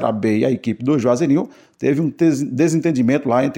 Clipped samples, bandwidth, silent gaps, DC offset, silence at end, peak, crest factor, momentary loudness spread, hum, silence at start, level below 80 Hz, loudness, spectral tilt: under 0.1%; 16 kHz; none; under 0.1%; 0 s; -2 dBFS; 14 dB; 4 LU; none; 0 s; -60 dBFS; -18 LUFS; -7 dB/octave